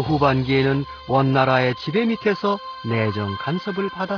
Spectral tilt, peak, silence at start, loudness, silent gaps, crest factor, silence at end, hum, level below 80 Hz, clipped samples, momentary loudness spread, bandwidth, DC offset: -8 dB/octave; -2 dBFS; 0 s; -21 LUFS; none; 18 dB; 0 s; none; -48 dBFS; under 0.1%; 8 LU; 5.4 kHz; under 0.1%